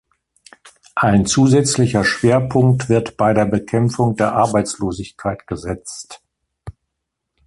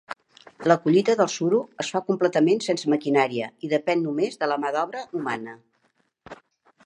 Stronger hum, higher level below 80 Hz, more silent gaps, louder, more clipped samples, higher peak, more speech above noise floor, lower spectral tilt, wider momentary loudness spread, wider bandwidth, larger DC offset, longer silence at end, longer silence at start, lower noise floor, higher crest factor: neither; first, -44 dBFS vs -74 dBFS; neither; first, -17 LUFS vs -23 LUFS; neither; about the same, -2 dBFS vs -2 dBFS; first, 62 dB vs 46 dB; about the same, -5.5 dB/octave vs -5.5 dB/octave; first, 13 LU vs 10 LU; about the same, 11.5 kHz vs 11 kHz; neither; first, 0.75 s vs 0.5 s; first, 0.95 s vs 0.1 s; first, -78 dBFS vs -69 dBFS; second, 16 dB vs 22 dB